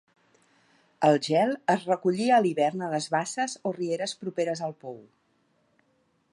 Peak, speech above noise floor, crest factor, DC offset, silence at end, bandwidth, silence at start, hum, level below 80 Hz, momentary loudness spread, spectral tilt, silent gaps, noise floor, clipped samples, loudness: -8 dBFS; 44 dB; 20 dB; under 0.1%; 1.3 s; 11.5 kHz; 1 s; none; -80 dBFS; 11 LU; -5 dB/octave; none; -70 dBFS; under 0.1%; -26 LUFS